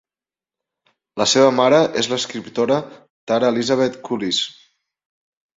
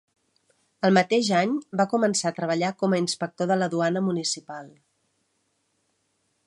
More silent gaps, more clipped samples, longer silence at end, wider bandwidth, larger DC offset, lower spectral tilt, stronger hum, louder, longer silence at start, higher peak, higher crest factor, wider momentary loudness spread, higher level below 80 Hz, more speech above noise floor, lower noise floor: first, 3.10-3.27 s vs none; neither; second, 1.05 s vs 1.75 s; second, 8 kHz vs 11.5 kHz; neither; about the same, -3.5 dB/octave vs -4.5 dB/octave; neither; first, -18 LUFS vs -24 LUFS; first, 1.15 s vs 0.8 s; first, -2 dBFS vs -6 dBFS; about the same, 18 dB vs 20 dB; first, 11 LU vs 7 LU; first, -62 dBFS vs -74 dBFS; first, over 72 dB vs 49 dB; first, under -90 dBFS vs -73 dBFS